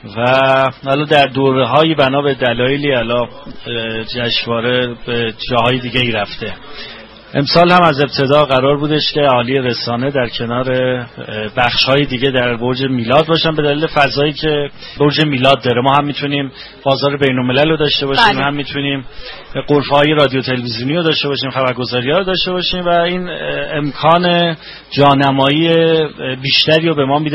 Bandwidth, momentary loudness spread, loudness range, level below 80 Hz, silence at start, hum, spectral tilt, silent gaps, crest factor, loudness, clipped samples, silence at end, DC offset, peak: 10.5 kHz; 10 LU; 4 LU; -40 dBFS; 0.05 s; none; -7 dB/octave; none; 14 dB; -13 LUFS; under 0.1%; 0 s; under 0.1%; 0 dBFS